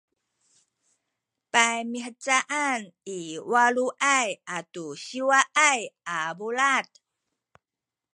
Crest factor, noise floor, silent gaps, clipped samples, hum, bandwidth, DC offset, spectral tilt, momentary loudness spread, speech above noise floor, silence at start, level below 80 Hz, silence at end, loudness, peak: 24 dB; -89 dBFS; none; under 0.1%; none; 11.5 kHz; under 0.1%; -1 dB/octave; 14 LU; 64 dB; 1.55 s; -84 dBFS; 1.35 s; -24 LUFS; -2 dBFS